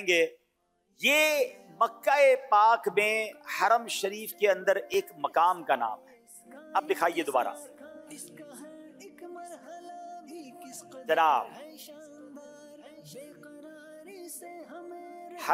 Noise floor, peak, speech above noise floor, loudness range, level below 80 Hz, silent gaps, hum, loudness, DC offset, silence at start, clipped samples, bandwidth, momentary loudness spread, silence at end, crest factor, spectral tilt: -74 dBFS; -12 dBFS; 47 dB; 20 LU; -84 dBFS; none; none; -27 LUFS; under 0.1%; 0 s; under 0.1%; 16 kHz; 25 LU; 0 s; 18 dB; -2 dB/octave